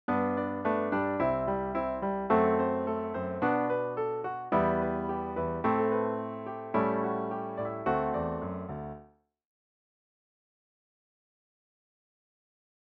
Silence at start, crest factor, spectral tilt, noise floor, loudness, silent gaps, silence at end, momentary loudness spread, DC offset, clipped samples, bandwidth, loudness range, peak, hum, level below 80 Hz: 0.1 s; 20 dB; -10 dB/octave; -58 dBFS; -31 LUFS; none; 3.85 s; 8 LU; under 0.1%; under 0.1%; 5.2 kHz; 8 LU; -12 dBFS; none; -56 dBFS